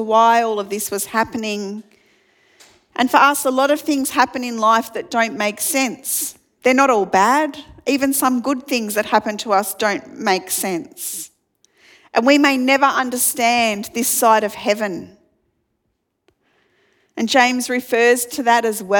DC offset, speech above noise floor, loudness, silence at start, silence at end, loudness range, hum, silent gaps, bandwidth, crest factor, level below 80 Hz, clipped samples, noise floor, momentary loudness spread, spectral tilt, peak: under 0.1%; 54 dB; -17 LUFS; 0 s; 0 s; 5 LU; none; none; 19 kHz; 18 dB; -62 dBFS; under 0.1%; -72 dBFS; 11 LU; -2.5 dB/octave; 0 dBFS